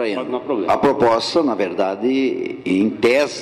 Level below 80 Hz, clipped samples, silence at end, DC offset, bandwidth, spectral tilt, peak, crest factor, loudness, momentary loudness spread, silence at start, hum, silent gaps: -56 dBFS; under 0.1%; 0 s; under 0.1%; 13.5 kHz; -5 dB/octave; -6 dBFS; 12 dB; -18 LUFS; 7 LU; 0 s; none; none